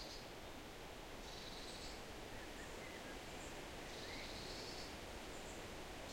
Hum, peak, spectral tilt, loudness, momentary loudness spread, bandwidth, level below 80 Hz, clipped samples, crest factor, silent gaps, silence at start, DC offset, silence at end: none; -38 dBFS; -3 dB/octave; -51 LUFS; 4 LU; 16.5 kHz; -60 dBFS; under 0.1%; 14 dB; none; 0 s; under 0.1%; 0 s